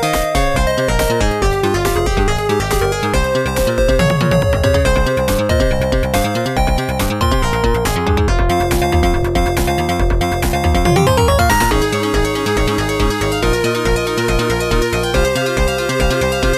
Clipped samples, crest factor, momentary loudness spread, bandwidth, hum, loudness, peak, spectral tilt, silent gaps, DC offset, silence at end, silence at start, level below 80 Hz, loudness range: under 0.1%; 12 dB; 3 LU; 14.5 kHz; none; -15 LUFS; -2 dBFS; -5 dB/octave; none; under 0.1%; 0 s; 0 s; -20 dBFS; 1 LU